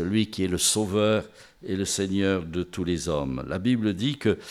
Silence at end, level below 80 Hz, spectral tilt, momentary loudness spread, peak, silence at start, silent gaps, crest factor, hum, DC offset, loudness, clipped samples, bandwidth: 0 s; -52 dBFS; -4.5 dB/octave; 8 LU; -10 dBFS; 0 s; none; 16 dB; none; under 0.1%; -26 LUFS; under 0.1%; 16 kHz